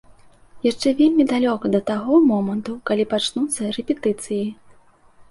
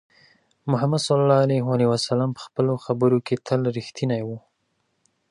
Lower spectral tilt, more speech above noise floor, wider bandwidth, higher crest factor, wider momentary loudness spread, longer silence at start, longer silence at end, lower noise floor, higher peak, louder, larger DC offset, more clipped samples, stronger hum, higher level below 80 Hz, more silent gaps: second, -5 dB/octave vs -6.5 dB/octave; second, 31 dB vs 50 dB; about the same, 11.5 kHz vs 11.5 kHz; about the same, 16 dB vs 18 dB; about the same, 9 LU vs 9 LU; about the same, 0.55 s vs 0.65 s; second, 0.8 s vs 0.95 s; second, -51 dBFS vs -72 dBFS; about the same, -4 dBFS vs -4 dBFS; about the same, -20 LUFS vs -22 LUFS; neither; neither; neither; first, -58 dBFS vs -64 dBFS; neither